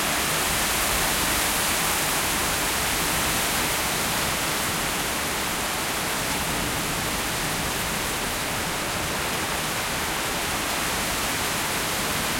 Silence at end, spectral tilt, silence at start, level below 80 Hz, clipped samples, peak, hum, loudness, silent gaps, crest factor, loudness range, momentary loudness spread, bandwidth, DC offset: 0 s; -2 dB/octave; 0 s; -42 dBFS; under 0.1%; -10 dBFS; none; -23 LUFS; none; 16 dB; 3 LU; 4 LU; 16.5 kHz; under 0.1%